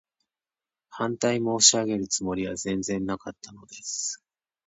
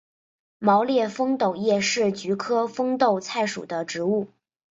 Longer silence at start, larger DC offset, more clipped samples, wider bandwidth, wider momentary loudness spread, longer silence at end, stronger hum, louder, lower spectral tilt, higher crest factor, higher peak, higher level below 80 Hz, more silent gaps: first, 0.9 s vs 0.6 s; neither; neither; first, 9.2 kHz vs 8 kHz; first, 22 LU vs 7 LU; about the same, 0.5 s vs 0.45 s; neither; about the same, -25 LUFS vs -24 LUFS; second, -2.5 dB/octave vs -4.5 dB/octave; about the same, 24 dB vs 20 dB; about the same, -4 dBFS vs -4 dBFS; first, -60 dBFS vs -70 dBFS; neither